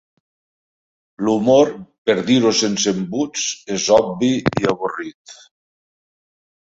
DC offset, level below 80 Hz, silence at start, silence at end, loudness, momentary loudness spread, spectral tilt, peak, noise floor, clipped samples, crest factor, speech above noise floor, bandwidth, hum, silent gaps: under 0.1%; -54 dBFS; 1.2 s; 1.4 s; -18 LUFS; 10 LU; -4 dB/octave; -2 dBFS; under -90 dBFS; under 0.1%; 18 dB; over 73 dB; 8 kHz; none; 1.98-2.05 s, 5.14-5.25 s